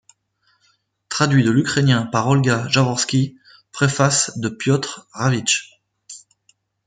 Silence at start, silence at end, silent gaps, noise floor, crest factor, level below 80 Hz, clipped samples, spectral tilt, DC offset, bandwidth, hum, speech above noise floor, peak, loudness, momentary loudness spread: 1.1 s; 0.7 s; none; -65 dBFS; 18 dB; -58 dBFS; under 0.1%; -4.5 dB/octave; under 0.1%; 9.6 kHz; none; 47 dB; -2 dBFS; -18 LUFS; 13 LU